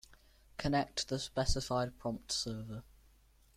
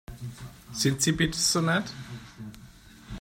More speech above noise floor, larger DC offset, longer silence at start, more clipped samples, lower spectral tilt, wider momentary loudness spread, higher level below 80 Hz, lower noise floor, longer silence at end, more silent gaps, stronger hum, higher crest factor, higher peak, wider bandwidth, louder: first, 30 dB vs 24 dB; neither; about the same, 0.1 s vs 0.1 s; neither; about the same, -4 dB/octave vs -3.5 dB/octave; second, 12 LU vs 21 LU; about the same, -48 dBFS vs -50 dBFS; first, -66 dBFS vs -50 dBFS; first, 0.75 s vs 0 s; neither; neither; about the same, 20 dB vs 18 dB; second, -18 dBFS vs -10 dBFS; about the same, 15.5 kHz vs 16 kHz; second, -37 LUFS vs -25 LUFS